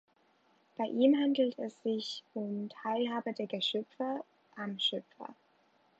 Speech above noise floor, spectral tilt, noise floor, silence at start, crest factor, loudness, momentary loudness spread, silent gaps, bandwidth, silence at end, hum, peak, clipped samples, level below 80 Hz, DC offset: 36 dB; -5.5 dB/octave; -70 dBFS; 0.8 s; 20 dB; -34 LUFS; 17 LU; none; 8 kHz; 0.65 s; none; -16 dBFS; under 0.1%; -90 dBFS; under 0.1%